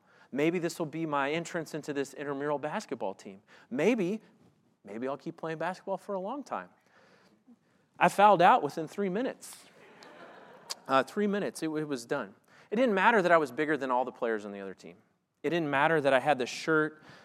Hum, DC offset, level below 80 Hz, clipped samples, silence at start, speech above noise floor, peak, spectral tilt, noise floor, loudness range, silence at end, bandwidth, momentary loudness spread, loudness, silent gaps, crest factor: none; under 0.1%; -88 dBFS; under 0.1%; 0.35 s; 34 dB; -8 dBFS; -5 dB/octave; -64 dBFS; 7 LU; 0.1 s; 15.5 kHz; 16 LU; -30 LUFS; none; 22 dB